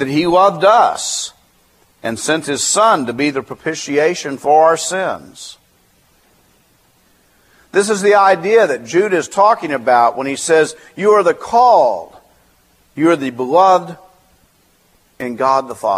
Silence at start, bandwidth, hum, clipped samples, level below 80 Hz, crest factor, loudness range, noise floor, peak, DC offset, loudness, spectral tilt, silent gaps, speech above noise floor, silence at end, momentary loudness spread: 0 s; 15 kHz; none; under 0.1%; -58 dBFS; 16 dB; 5 LU; -55 dBFS; 0 dBFS; under 0.1%; -14 LUFS; -3.5 dB/octave; none; 41 dB; 0 s; 13 LU